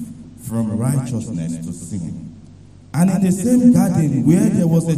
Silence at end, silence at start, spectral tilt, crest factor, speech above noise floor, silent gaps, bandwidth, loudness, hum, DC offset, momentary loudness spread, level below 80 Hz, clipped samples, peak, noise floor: 0 s; 0 s; -7.5 dB/octave; 16 dB; 26 dB; none; 15 kHz; -17 LUFS; none; 0.2%; 17 LU; -48 dBFS; under 0.1%; -2 dBFS; -42 dBFS